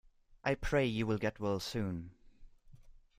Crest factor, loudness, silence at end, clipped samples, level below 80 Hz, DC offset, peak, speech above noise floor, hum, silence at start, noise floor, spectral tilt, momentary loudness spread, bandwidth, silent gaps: 20 dB; -36 LUFS; 0.25 s; under 0.1%; -52 dBFS; under 0.1%; -18 dBFS; 23 dB; none; 0.3 s; -57 dBFS; -6 dB/octave; 9 LU; 15.5 kHz; none